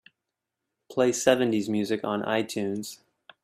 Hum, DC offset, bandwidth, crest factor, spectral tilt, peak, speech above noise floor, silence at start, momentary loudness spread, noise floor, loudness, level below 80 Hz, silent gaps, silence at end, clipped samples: none; under 0.1%; 15.5 kHz; 22 dB; -4.5 dB/octave; -6 dBFS; 60 dB; 0.9 s; 11 LU; -85 dBFS; -26 LUFS; -72 dBFS; none; 0.5 s; under 0.1%